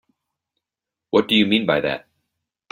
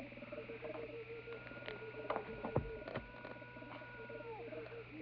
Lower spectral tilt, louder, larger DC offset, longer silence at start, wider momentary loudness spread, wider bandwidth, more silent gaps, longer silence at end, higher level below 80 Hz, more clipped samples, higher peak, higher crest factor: about the same, -6 dB/octave vs -5 dB/octave; first, -19 LUFS vs -47 LUFS; neither; first, 1.15 s vs 0 s; about the same, 9 LU vs 9 LU; first, 16 kHz vs 5.4 kHz; neither; first, 0.75 s vs 0 s; about the same, -60 dBFS vs -62 dBFS; neither; first, -4 dBFS vs -20 dBFS; second, 20 dB vs 26 dB